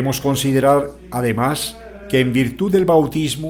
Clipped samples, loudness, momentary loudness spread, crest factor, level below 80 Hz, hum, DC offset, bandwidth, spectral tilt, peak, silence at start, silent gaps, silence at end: under 0.1%; -18 LUFS; 9 LU; 14 dB; -44 dBFS; none; under 0.1%; 19.5 kHz; -5.5 dB/octave; -2 dBFS; 0 s; none; 0 s